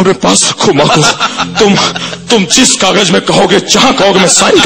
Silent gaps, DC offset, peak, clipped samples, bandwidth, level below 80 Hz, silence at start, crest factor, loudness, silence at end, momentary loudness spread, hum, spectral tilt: none; under 0.1%; 0 dBFS; 0.8%; over 20 kHz; -40 dBFS; 0 s; 8 dB; -7 LUFS; 0 s; 6 LU; none; -3 dB/octave